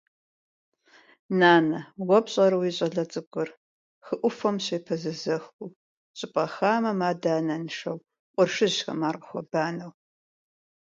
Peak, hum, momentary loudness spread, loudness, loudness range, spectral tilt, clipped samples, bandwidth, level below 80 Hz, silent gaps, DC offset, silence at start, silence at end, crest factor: -4 dBFS; none; 14 LU; -26 LUFS; 6 LU; -5 dB/octave; under 0.1%; 7.8 kHz; -76 dBFS; 3.27-3.31 s, 3.57-4.01 s, 5.53-5.59 s, 5.76-6.14 s, 8.19-8.34 s; under 0.1%; 1.3 s; 1 s; 22 dB